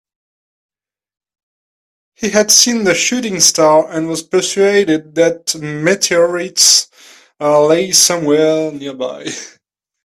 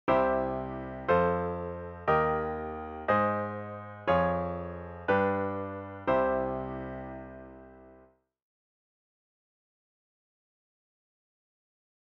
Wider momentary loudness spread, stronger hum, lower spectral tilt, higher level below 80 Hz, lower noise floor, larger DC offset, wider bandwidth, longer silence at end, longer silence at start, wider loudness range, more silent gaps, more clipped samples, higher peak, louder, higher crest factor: about the same, 14 LU vs 14 LU; neither; second, -2 dB/octave vs -9 dB/octave; about the same, -58 dBFS vs -54 dBFS; second, -44 dBFS vs -61 dBFS; neither; first, over 20 kHz vs 6 kHz; second, 0.55 s vs 4.05 s; first, 2.2 s vs 0.05 s; second, 3 LU vs 10 LU; neither; neither; first, 0 dBFS vs -14 dBFS; first, -12 LUFS vs -30 LUFS; second, 14 dB vs 20 dB